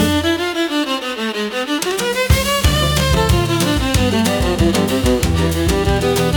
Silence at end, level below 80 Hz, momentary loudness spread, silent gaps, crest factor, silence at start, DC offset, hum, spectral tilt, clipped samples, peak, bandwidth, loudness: 0 s; -24 dBFS; 5 LU; none; 16 dB; 0 s; under 0.1%; none; -4.5 dB/octave; under 0.1%; 0 dBFS; 19 kHz; -16 LUFS